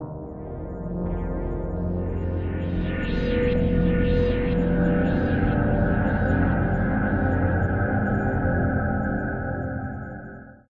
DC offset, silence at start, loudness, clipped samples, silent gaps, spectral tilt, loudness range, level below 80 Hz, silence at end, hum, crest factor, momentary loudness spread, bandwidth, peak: under 0.1%; 0 s; -24 LUFS; under 0.1%; none; -10.5 dB/octave; 4 LU; -32 dBFS; 0.15 s; none; 14 dB; 11 LU; 5.2 kHz; -8 dBFS